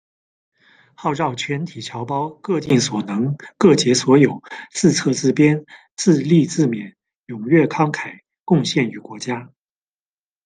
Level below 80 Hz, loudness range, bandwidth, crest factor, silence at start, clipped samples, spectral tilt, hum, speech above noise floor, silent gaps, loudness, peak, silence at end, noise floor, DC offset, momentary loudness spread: -62 dBFS; 5 LU; 10 kHz; 18 dB; 1 s; under 0.1%; -5.5 dB/octave; none; over 72 dB; 7.16-7.23 s, 8.40-8.46 s; -18 LUFS; 0 dBFS; 1 s; under -90 dBFS; under 0.1%; 15 LU